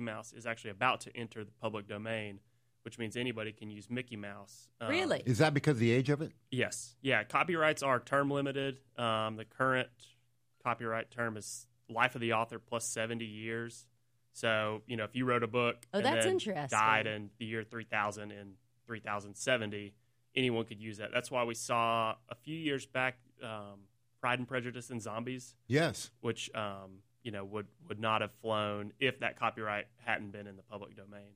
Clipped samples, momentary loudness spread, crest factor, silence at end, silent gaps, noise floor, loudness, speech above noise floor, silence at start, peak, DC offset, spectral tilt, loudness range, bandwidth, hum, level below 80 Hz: under 0.1%; 16 LU; 24 dB; 0.1 s; none; -73 dBFS; -35 LUFS; 38 dB; 0 s; -12 dBFS; under 0.1%; -4.5 dB/octave; 6 LU; 15.5 kHz; none; -74 dBFS